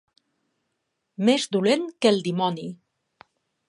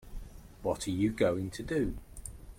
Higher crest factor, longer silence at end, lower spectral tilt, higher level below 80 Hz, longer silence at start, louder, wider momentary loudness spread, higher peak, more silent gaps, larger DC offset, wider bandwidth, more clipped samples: about the same, 20 dB vs 20 dB; first, 0.95 s vs 0 s; about the same, -5 dB/octave vs -6 dB/octave; second, -76 dBFS vs -48 dBFS; first, 1.2 s vs 0 s; first, -23 LUFS vs -33 LUFS; second, 14 LU vs 21 LU; first, -6 dBFS vs -14 dBFS; neither; neither; second, 11.5 kHz vs 16.5 kHz; neither